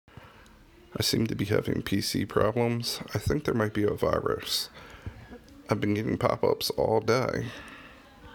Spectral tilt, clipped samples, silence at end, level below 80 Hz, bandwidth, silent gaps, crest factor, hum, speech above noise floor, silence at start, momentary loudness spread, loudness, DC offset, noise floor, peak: -5 dB/octave; under 0.1%; 0 s; -50 dBFS; 19.5 kHz; none; 20 dB; none; 27 dB; 0.2 s; 18 LU; -28 LUFS; under 0.1%; -54 dBFS; -8 dBFS